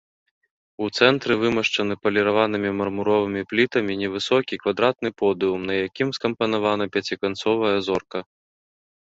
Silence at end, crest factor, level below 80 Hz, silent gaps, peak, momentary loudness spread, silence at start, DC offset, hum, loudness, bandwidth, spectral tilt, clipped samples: 0.8 s; 20 dB; -58 dBFS; none; -2 dBFS; 6 LU; 0.8 s; under 0.1%; none; -22 LUFS; 8 kHz; -5 dB/octave; under 0.1%